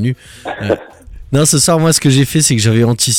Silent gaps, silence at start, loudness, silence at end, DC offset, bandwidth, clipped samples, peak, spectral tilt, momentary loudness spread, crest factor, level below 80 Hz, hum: none; 0 s; -12 LUFS; 0 s; under 0.1%; 17.5 kHz; under 0.1%; 0 dBFS; -4 dB/octave; 12 LU; 12 dB; -38 dBFS; none